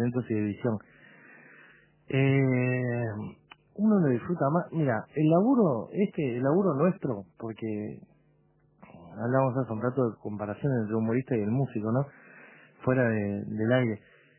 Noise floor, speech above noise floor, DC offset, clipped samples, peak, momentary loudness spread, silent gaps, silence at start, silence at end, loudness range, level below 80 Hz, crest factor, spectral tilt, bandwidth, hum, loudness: -65 dBFS; 38 dB; under 0.1%; under 0.1%; -10 dBFS; 13 LU; none; 0 s; 0.4 s; 5 LU; -64 dBFS; 18 dB; -8 dB/octave; 3.2 kHz; none; -28 LUFS